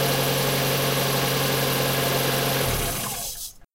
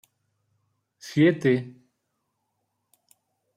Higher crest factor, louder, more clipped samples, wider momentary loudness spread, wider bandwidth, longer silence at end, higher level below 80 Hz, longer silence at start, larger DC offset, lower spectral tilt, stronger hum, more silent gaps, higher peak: second, 14 dB vs 20 dB; about the same, -22 LUFS vs -23 LUFS; neither; second, 6 LU vs 24 LU; about the same, 16 kHz vs 15 kHz; second, 0.1 s vs 1.85 s; first, -42 dBFS vs -72 dBFS; second, 0 s vs 1.05 s; neither; second, -3.5 dB/octave vs -7 dB/octave; neither; neither; about the same, -10 dBFS vs -8 dBFS